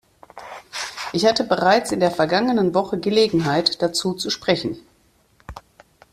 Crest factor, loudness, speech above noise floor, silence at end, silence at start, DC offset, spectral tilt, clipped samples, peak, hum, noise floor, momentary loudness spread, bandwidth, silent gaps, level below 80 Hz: 20 dB; -20 LUFS; 40 dB; 0.55 s; 0.35 s; under 0.1%; -4.5 dB/octave; under 0.1%; -2 dBFS; none; -59 dBFS; 20 LU; 14.5 kHz; none; -54 dBFS